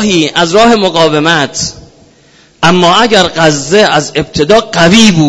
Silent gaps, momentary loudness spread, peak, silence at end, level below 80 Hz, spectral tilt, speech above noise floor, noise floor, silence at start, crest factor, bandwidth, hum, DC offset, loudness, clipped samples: none; 7 LU; 0 dBFS; 0 s; -36 dBFS; -4 dB/octave; 36 dB; -43 dBFS; 0 s; 8 dB; 11 kHz; none; under 0.1%; -7 LUFS; 2%